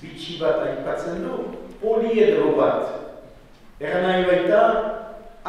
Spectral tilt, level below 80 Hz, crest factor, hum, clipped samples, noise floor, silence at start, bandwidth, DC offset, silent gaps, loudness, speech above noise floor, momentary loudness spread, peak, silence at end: -6.5 dB/octave; -50 dBFS; 18 dB; none; under 0.1%; -46 dBFS; 0 s; 10.5 kHz; under 0.1%; none; -21 LUFS; 26 dB; 16 LU; -4 dBFS; 0 s